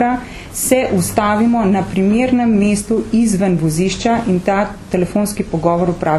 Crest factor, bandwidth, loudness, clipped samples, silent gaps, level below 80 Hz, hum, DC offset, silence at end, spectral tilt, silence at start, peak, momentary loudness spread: 14 dB; 13 kHz; -15 LUFS; under 0.1%; none; -36 dBFS; none; under 0.1%; 0 s; -5.5 dB/octave; 0 s; 0 dBFS; 5 LU